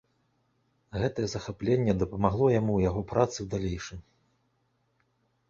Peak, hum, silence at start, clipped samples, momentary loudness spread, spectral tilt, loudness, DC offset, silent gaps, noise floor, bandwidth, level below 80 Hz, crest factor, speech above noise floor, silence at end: -8 dBFS; none; 0.95 s; under 0.1%; 12 LU; -7 dB/octave; -28 LUFS; under 0.1%; none; -73 dBFS; 7.6 kHz; -48 dBFS; 22 dB; 46 dB; 1.5 s